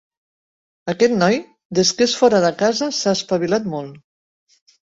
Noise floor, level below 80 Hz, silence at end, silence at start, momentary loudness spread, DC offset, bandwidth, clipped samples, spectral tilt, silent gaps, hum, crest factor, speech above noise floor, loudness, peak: under -90 dBFS; -60 dBFS; 0.85 s; 0.85 s; 13 LU; under 0.1%; 8 kHz; under 0.1%; -4 dB/octave; 1.65-1.70 s; none; 18 dB; over 73 dB; -18 LUFS; -2 dBFS